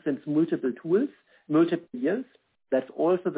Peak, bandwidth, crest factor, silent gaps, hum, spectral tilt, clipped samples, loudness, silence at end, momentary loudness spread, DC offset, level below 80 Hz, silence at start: -12 dBFS; 4 kHz; 16 dB; none; none; -11.5 dB/octave; under 0.1%; -27 LUFS; 0 s; 7 LU; under 0.1%; -76 dBFS; 0.05 s